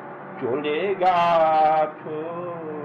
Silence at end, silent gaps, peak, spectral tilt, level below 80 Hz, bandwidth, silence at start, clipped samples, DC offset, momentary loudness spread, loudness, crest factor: 0 s; none; -8 dBFS; -6.5 dB/octave; -66 dBFS; 7 kHz; 0 s; under 0.1%; under 0.1%; 14 LU; -22 LUFS; 14 dB